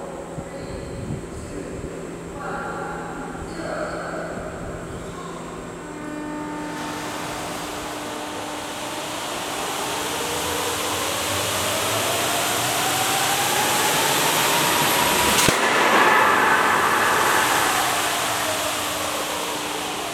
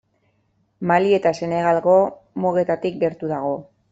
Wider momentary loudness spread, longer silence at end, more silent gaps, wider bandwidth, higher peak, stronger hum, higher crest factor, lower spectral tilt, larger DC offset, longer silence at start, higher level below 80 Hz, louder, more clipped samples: first, 16 LU vs 9 LU; second, 0 s vs 0.3 s; neither; first, 19.5 kHz vs 8 kHz; about the same, -2 dBFS vs -4 dBFS; neither; about the same, 20 dB vs 18 dB; second, -2 dB/octave vs -7 dB/octave; neither; second, 0 s vs 0.8 s; first, -48 dBFS vs -62 dBFS; about the same, -21 LUFS vs -20 LUFS; neither